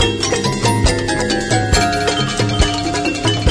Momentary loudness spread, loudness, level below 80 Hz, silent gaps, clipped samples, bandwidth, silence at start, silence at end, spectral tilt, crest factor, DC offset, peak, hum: 3 LU; -16 LUFS; -26 dBFS; none; under 0.1%; 11 kHz; 0 s; 0 s; -4 dB/octave; 14 dB; under 0.1%; -2 dBFS; none